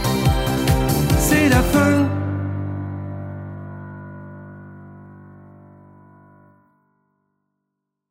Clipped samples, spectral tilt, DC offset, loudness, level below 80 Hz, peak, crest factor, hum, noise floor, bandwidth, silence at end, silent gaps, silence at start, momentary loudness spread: under 0.1%; -5.5 dB/octave; under 0.1%; -19 LUFS; -32 dBFS; -4 dBFS; 18 dB; none; -79 dBFS; 16.5 kHz; 2.7 s; none; 0 s; 24 LU